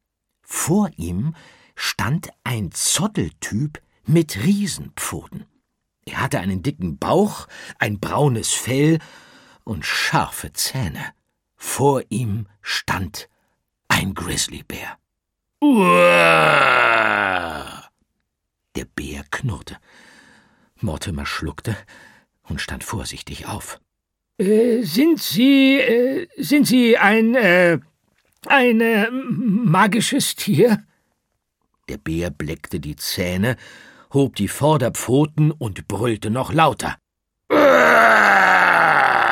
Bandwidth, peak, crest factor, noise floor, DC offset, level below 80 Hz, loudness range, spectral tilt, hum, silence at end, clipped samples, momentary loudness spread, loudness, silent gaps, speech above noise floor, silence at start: 17.5 kHz; 0 dBFS; 18 dB; -78 dBFS; under 0.1%; -46 dBFS; 13 LU; -4.5 dB/octave; none; 0 s; under 0.1%; 18 LU; -18 LUFS; none; 60 dB; 0.5 s